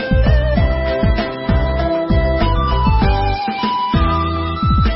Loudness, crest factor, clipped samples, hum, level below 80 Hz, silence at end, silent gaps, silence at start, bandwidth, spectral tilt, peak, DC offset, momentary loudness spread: -16 LUFS; 12 dB; under 0.1%; none; -18 dBFS; 0 s; none; 0 s; 5.8 kHz; -11 dB/octave; -2 dBFS; under 0.1%; 4 LU